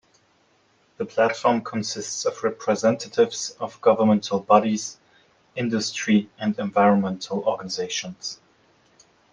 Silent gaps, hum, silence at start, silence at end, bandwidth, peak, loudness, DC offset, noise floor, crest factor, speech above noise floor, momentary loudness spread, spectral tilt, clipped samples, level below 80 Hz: none; none; 1 s; 0.95 s; 10 kHz; -2 dBFS; -23 LUFS; under 0.1%; -62 dBFS; 22 dB; 40 dB; 11 LU; -4.5 dB/octave; under 0.1%; -70 dBFS